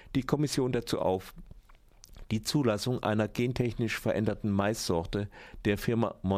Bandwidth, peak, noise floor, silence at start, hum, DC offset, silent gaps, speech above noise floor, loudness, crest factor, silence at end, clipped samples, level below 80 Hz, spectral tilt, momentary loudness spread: 16 kHz; -14 dBFS; -56 dBFS; 0.05 s; none; under 0.1%; none; 26 dB; -30 LUFS; 18 dB; 0 s; under 0.1%; -50 dBFS; -6 dB/octave; 7 LU